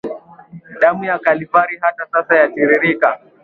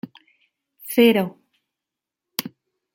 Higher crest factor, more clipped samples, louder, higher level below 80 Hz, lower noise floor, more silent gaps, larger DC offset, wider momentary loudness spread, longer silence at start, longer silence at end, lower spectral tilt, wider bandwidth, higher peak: second, 16 dB vs 22 dB; neither; first, -15 LUFS vs -21 LUFS; first, -62 dBFS vs -70 dBFS; second, -39 dBFS vs -86 dBFS; neither; neither; second, 7 LU vs 24 LU; second, 0.05 s vs 0.85 s; second, 0.25 s vs 0.45 s; first, -8 dB/octave vs -5 dB/octave; second, 4.8 kHz vs 17 kHz; about the same, 0 dBFS vs -2 dBFS